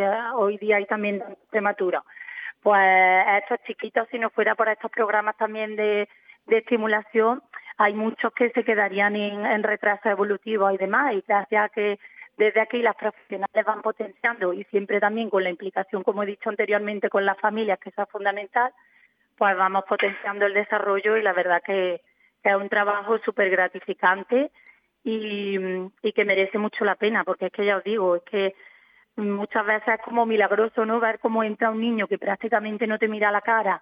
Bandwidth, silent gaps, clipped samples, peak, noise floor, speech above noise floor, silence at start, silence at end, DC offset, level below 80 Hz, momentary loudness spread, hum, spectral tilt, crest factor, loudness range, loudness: 5.2 kHz; none; under 0.1%; -6 dBFS; -61 dBFS; 38 dB; 0 s; 0.05 s; under 0.1%; -84 dBFS; 7 LU; none; -8 dB/octave; 18 dB; 4 LU; -23 LUFS